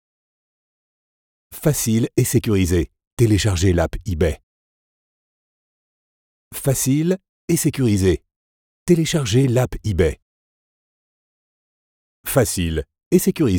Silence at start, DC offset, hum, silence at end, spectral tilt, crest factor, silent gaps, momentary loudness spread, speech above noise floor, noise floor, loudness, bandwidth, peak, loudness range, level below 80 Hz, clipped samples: 1.5 s; under 0.1%; none; 0 s; -5.5 dB/octave; 18 dB; 3.07-3.17 s, 4.43-6.51 s, 7.29-7.48 s, 8.36-8.86 s, 10.22-12.24 s, 13.06-13.11 s; 9 LU; over 72 dB; under -90 dBFS; -19 LUFS; over 20 kHz; -2 dBFS; 5 LU; -38 dBFS; under 0.1%